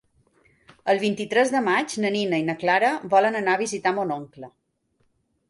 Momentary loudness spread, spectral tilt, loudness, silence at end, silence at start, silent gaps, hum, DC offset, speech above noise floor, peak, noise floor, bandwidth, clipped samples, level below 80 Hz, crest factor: 8 LU; -4.5 dB/octave; -23 LUFS; 1 s; 0.85 s; none; none; under 0.1%; 47 dB; -6 dBFS; -69 dBFS; 11.5 kHz; under 0.1%; -70 dBFS; 18 dB